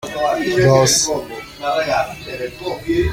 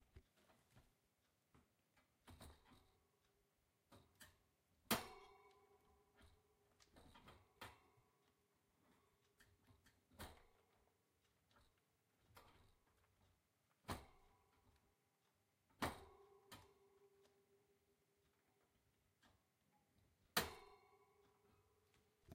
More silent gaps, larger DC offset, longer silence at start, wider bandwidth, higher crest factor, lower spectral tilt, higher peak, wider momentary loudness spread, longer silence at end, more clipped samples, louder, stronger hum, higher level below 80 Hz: neither; neither; about the same, 0.05 s vs 0.15 s; about the same, 16.5 kHz vs 15.5 kHz; second, 16 dB vs 34 dB; about the same, -4 dB/octave vs -3 dB/octave; first, -2 dBFS vs -24 dBFS; second, 14 LU vs 23 LU; about the same, 0 s vs 0 s; neither; first, -17 LUFS vs -49 LUFS; neither; first, -38 dBFS vs -76 dBFS